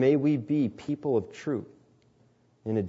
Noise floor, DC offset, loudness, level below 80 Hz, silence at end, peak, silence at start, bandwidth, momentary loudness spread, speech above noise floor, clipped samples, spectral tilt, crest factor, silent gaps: -64 dBFS; under 0.1%; -29 LUFS; -68 dBFS; 0 s; -12 dBFS; 0 s; 7.8 kHz; 9 LU; 37 dB; under 0.1%; -8.5 dB/octave; 16 dB; none